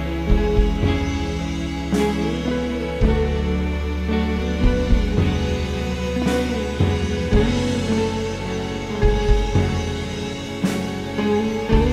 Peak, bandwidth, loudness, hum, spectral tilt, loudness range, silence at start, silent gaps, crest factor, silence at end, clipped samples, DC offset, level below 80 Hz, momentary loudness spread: -4 dBFS; 13.5 kHz; -22 LUFS; none; -6.5 dB/octave; 1 LU; 0 s; none; 16 dB; 0 s; under 0.1%; under 0.1%; -24 dBFS; 6 LU